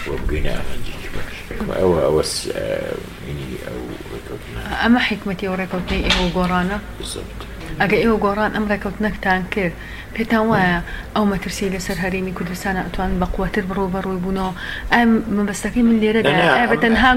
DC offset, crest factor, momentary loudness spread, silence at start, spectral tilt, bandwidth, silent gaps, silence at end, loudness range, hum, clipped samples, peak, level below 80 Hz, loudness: under 0.1%; 18 dB; 15 LU; 0 s; -5 dB/octave; 16.5 kHz; none; 0 s; 4 LU; none; under 0.1%; 0 dBFS; -32 dBFS; -19 LUFS